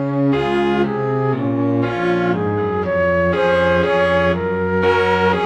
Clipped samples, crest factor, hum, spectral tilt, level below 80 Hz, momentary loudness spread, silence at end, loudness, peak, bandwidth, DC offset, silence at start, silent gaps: under 0.1%; 12 dB; none; -7.5 dB/octave; -44 dBFS; 4 LU; 0 s; -17 LUFS; -4 dBFS; 9 kHz; under 0.1%; 0 s; none